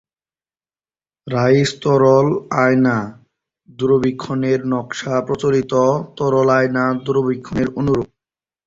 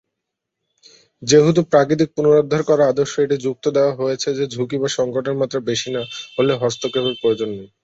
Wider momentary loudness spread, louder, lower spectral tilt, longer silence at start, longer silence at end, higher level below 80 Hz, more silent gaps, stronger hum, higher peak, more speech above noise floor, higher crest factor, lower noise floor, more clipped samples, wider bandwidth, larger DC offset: about the same, 8 LU vs 8 LU; about the same, -17 LUFS vs -18 LUFS; first, -7 dB/octave vs -5 dB/octave; about the same, 1.25 s vs 1.2 s; first, 0.6 s vs 0.2 s; first, -50 dBFS vs -58 dBFS; neither; neither; about the same, -2 dBFS vs -2 dBFS; first, over 74 dB vs 62 dB; about the same, 14 dB vs 16 dB; first, under -90 dBFS vs -80 dBFS; neither; about the same, 7.8 kHz vs 8 kHz; neither